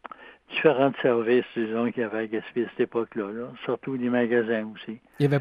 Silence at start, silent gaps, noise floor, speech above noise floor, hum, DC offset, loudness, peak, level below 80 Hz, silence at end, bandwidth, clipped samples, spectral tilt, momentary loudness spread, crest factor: 0.05 s; none; -45 dBFS; 20 dB; none; under 0.1%; -26 LUFS; -6 dBFS; -70 dBFS; 0 s; 9.8 kHz; under 0.1%; -8.5 dB/octave; 12 LU; 20 dB